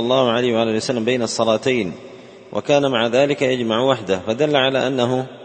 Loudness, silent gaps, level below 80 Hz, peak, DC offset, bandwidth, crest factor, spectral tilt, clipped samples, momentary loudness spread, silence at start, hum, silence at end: -18 LUFS; none; -58 dBFS; 0 dBFS; under 0.1%; 8.8 kHz; 18 dB; -5 dB/octave; under 0.1%; 6 LU; 0 s; none; 0 s